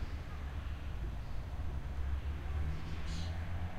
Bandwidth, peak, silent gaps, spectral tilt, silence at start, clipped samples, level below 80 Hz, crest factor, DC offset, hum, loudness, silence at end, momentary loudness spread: 13 kHz; -26 dBFS; none; -6.5 dB/octave; 0 s; under 0.1%; -40 dBFS; 12 dB; under 0.1%; none; -42 LUFS; 0 s; 4 LU